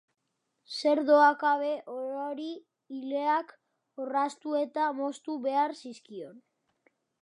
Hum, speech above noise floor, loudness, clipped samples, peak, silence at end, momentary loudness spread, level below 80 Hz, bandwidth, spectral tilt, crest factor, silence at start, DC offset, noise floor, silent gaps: none; 49 dB; -29 LUFS; under 0.1%; -10 dBFS; 0.85 s; 21 LU; under -90 dBFS; 11 kHz; -3.5 dB/octave; 20 dB; 0.7 s; under 0.1%; -77 dBFS; none